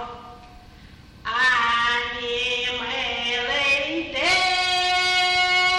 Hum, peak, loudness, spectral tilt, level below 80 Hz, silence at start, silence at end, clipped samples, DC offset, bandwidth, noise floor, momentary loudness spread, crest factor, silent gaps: none; -10 dBFS; -20 LUFS; -1 dB/octave; -50 dBFS; 0 s; 0 s; under 0.1%; under 0.1%; 12.5 kHz; -46 dBFS; 8 LU; 14 dB; none